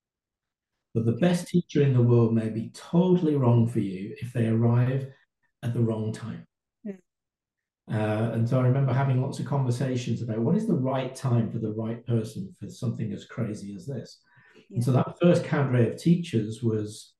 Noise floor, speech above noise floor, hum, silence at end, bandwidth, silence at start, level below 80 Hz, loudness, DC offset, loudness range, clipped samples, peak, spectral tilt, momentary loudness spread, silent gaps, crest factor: -89 dBFS; 64 dB; none; 0.15 s; 12 kHz; 0.95 s; -66 dBFS; -26 LUFS; under 0.1%; 7 LU; under 0.1%; -10 dBFS; -8 dB/octave; 14 LU; none; 16 dB